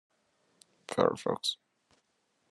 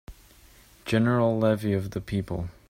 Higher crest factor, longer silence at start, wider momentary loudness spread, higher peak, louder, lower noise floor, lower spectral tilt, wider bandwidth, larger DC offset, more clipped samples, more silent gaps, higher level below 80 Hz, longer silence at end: first, 26 dB vs 18 dB; first, 0.9 s vs 0.1 s; first, 17 LU vs 9 LU; about the same, -10 dBFS vs -10 dBFS; second, -31 LUFS vs -26 LUFS; first, -76 dBFS vs -54 dBFS; second, -4 dB/octave vs -7.5 dB/octave; second, 12.5 kHz vs 16 kHz; neither; neither; neither; second, -80 dBFS vs -50 dBFS; first, 0.95 s vs 0.2 s